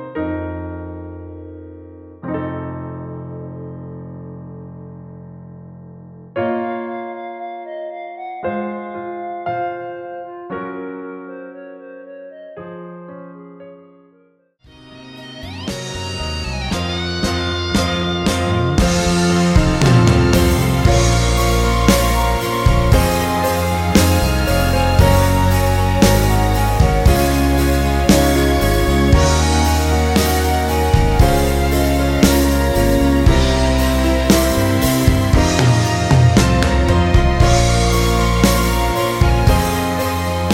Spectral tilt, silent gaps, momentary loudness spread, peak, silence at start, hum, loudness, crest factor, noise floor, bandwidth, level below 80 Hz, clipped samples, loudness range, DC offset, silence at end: -5.5 dB/octave; none; 20 LU; 0 dBFS; 0 s; none; -15 LUFS; 16 dB; -55 dBFS; 17 kHz; -22 dBFS; under 0.1%; 17 LU; under 0.1%; 0 s